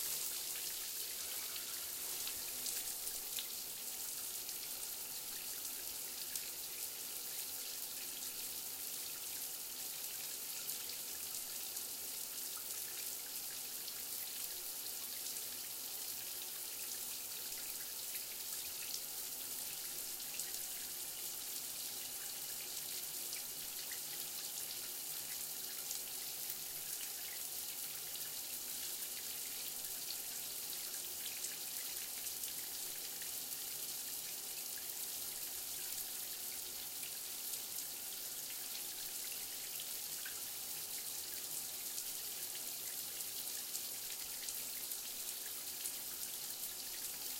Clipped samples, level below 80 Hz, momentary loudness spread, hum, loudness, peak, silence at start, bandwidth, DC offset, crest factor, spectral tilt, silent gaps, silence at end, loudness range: under 0.1%; -76 dBFS; 1 LU; none; -41 LUFS; -20 dBFS; 0 s; 17 kHz; under 0.1%; 24 dB; 1 dB/octave; none; 0 s; 1 LU